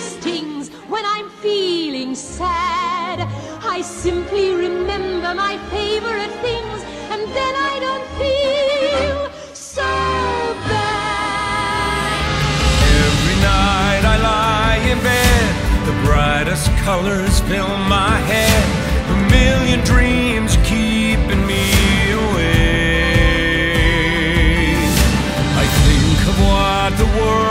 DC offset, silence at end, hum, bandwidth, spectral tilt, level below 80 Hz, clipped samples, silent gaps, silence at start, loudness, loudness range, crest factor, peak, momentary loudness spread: under 0.1%; 0 s; none; 16 kHz; -5 dB/octave; -22 dBFS; under 0.1%; none; 0 s; -16 LUFS; 6 LU; 16 dB; 0 dBFS; 9 LU